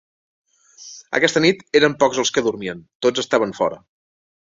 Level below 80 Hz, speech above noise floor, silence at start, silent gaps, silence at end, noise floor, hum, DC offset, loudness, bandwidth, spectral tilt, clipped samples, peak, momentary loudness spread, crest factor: -60 dBFS; 25 dB; 0.8 s; 2.95-3.00 s; 0.65 s; -43 dBFS; none; under 0.1%; -19 LUFS; 7.8 kHz; -3.5 dB/octave; under 0.1%; -2 dBFS; 14 LU; 20 dB